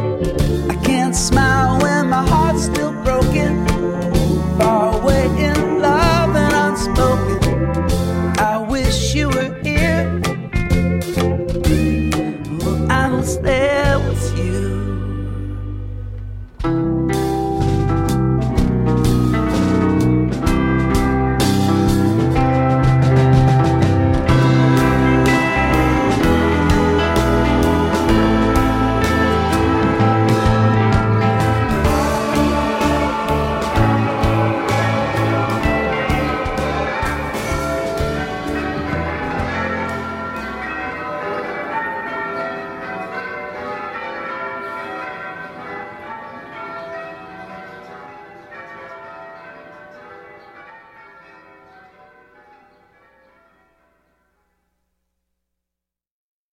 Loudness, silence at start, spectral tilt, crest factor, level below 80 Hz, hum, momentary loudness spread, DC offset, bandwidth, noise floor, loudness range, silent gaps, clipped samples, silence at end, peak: -17 LUFS; 0 s; -6 dB/octave; 16 dB; -26 dBFS; none; 14 LU; under 0.1%; 16.5 kHz; -86 dBFS; 13 LU; none; under 0.1%; 5.75 s; -2 dBFS